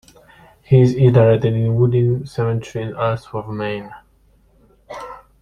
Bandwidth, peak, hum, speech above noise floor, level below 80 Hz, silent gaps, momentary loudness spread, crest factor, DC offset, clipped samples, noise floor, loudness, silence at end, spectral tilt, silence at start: 7 kHz; -2 dBFS; none; 39 dB; -48 dBFS; none; 21 LU; 16 dB; under 0.1%; under 0.1%; -55 dBFS; -17 LUFS; 0.25 s; -9 dB/octave; 0.7 s